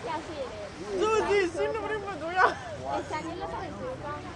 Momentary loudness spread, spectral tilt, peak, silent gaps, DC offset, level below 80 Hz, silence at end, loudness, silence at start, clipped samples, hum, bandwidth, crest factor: 12 LU; -4.5 dB/octave; -10 dBFS; none; under 0.1%; -54 dBFS; 0 s; -30 LUFS; 0 s; under 0.1%; none; 11 kHz; 20 dB